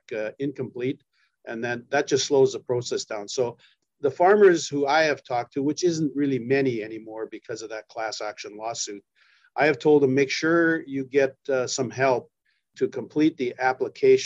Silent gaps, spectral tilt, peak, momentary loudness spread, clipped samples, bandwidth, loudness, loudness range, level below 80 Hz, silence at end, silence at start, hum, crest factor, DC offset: none; -4.5 dB/octave; -6 dBFS; 15 LU; under 0.1%; 8 kHz; -24 LUFS; 6 LU; -74 dBFS; 0 s; 0.1 s; none; 18 dB; under 0.1%